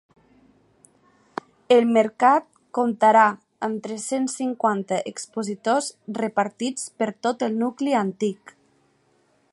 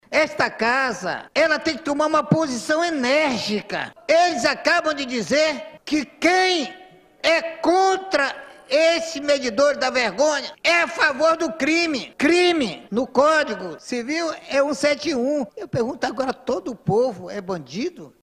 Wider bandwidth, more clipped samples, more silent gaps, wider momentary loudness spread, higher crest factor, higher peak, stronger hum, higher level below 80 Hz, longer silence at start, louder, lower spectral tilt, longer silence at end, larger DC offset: second, 11.5 kHz vs 13.5 kHz; neither; neither; first, 13 LU vs 9 LU; about the same, 20 dB vs 16 dB; about the same, -4 dBFS vs -4 dBFS; neither; second, -76 dBFS vs -58 dBFS; first, 1.7 s vs 0.1 s; about the same, -23 LUFS vs -21 LUFS; about the same, -4.5 dB/octave vs -3.5 dB/octave; first, 1.2 s vs 0.15 s; neither